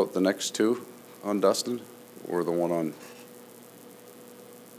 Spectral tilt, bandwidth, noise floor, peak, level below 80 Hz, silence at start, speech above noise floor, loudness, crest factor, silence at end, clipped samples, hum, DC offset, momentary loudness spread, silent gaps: -4.5 dB/octave; 16 kHz; -49 dBFS; -10 dBFS; -78 dBFS; 0 s; 22 dB; -28 LUFS; 20 dB; 0 s; under 0.1%; 60 Hz at -55 dBFS; under 0.1%; 23 LU; none